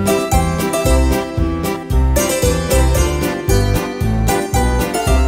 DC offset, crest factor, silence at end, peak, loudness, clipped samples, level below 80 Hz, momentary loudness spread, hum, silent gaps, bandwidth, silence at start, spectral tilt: under 0.1%; 14 dB; 0 s; 0 dBFS; -16 LUFS; under 0.1%; -18 dBFS; 4 LU; none; none; 16.5 kHz; 0 s; -5 dB/octave